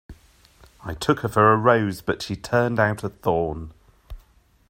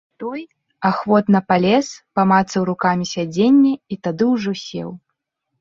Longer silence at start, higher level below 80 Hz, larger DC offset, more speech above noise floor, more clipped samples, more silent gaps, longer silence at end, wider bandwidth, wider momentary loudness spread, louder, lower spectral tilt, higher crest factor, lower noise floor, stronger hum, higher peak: about the same, 0.1 s vs 0.2 s; first, -46 dBFS vs -58 dBFS; neither; second, 36 dB vs 58 dB; neither; neither; second, 0.5 s vs 0.65 s; first, 16 kHz vs 7.6 kHz; first, 18 LU vs 14 LU; second, -22 LUFS vs -18 LUFS; about the same, -6.5 dB/octave vs -6 dB/octave; about the same, 20 dB vs 16 dB; second, -57 dBFS vs -75 dBFS; neither; about the same, -4 dBFS vs -2 dBFS